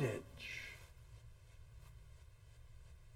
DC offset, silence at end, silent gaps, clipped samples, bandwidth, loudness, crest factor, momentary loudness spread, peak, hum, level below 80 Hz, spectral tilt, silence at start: under 0.1%; 0 s; none; under 0.1%; 17 kHz; -52 LUFS; 24 dB; 15 LU; -26 dBFS; none; -60 dBFS; -5.5 dB/octave; 0 s